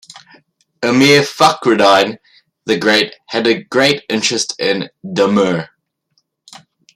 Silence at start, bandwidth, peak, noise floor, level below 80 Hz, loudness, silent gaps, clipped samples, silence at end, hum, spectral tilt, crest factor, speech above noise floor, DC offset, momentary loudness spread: 0.15 s; 16 kHz; 0 dBFS; -65 dBFS; -58 dBFS; -13 LUFS; none; under 0.1%; 1.3 s; none; -3.5 dB/octave; 16 dB; 51 dB; under 0.1%; 11 LU